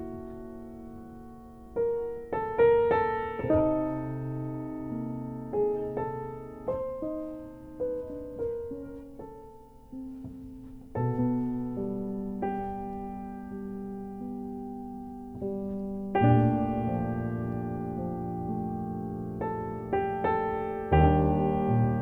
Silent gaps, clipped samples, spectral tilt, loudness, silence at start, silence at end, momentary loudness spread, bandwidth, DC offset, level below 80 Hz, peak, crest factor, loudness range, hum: none; under 0.1%; -10 dB/octave; -30 LUFS; 0 s; 0 s; 19 LU; 4.3 kHz; under 0.1%; -44 dBFS; -10 dBFS; 20 dB; 10 LU; none